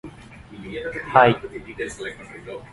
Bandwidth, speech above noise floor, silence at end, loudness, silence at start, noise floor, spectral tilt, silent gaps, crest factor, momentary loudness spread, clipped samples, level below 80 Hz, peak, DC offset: 11.5 kHz; 20 dB; 0 s; -21 LUFS; 0.05 s; -43 dBFS; -5.5 dB/octave; none; 24 dB; 23 LU; under 0.1%; -50 dBFS; 0 dBFS; under 0.1%